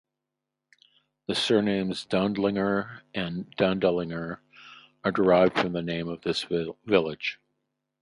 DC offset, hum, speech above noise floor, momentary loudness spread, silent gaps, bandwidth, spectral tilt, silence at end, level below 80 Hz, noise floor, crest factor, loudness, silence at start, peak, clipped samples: under 0.1%; none; 60 dB; 11 LU; none; 11.5 kHz; -6 dB/octave; 0.65 s; -60 dBFS; -86 dBFS; 22 dB; -27 LUFS; 1.3 s; -6 dBFS; under 0.1%